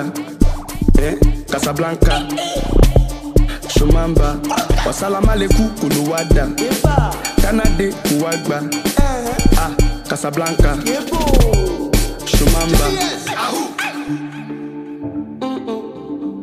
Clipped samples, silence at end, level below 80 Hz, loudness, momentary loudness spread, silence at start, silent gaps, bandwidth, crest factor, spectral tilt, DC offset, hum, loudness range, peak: under 0.1%; 0 s; -18 dBFS; -17 LUFS; 10 LU; 0 s; none; 15.5 kHz; 14 dB; -5 dB/octave; under 0.1%; none; 3 LU; 0 dBFS